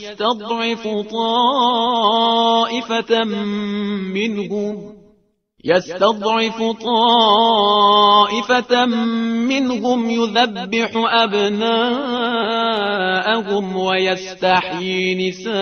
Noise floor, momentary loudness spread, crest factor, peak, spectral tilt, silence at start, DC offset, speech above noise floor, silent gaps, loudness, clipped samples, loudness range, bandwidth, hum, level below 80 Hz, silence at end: -59 dBFS; 9 LU; 16 dB; 0 dBFS; -4.5 dB/octave; 0 s; under 0.1%; 42 dB; none; -17 LUFS; under 0.1%; 6 LU; 6.6 kHz; none; -60 dBFS; 0 s